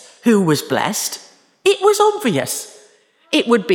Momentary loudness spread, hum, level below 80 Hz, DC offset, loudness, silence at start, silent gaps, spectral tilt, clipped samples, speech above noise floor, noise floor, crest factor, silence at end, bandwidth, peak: 10 LU; none; -68 dBFS; under 0.1%; -17 LUFS; 0.25 s; none; -4 dB/octave; under 0.1%; 37 dB; -52 dBFS; 16 dB; 0 s; over 20 kHz; -2 dBFS